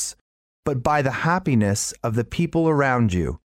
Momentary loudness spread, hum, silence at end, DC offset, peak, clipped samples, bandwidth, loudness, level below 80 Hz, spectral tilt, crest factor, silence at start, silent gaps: 7 LU; none; 0.15 s; under 0.1%; -6 dBFS; under 0.1%; 16 kHz; -22 LUFS; -42 dBFS; -5.5 dB/octave; 16 dB; 0 s; 0.21-0.63 s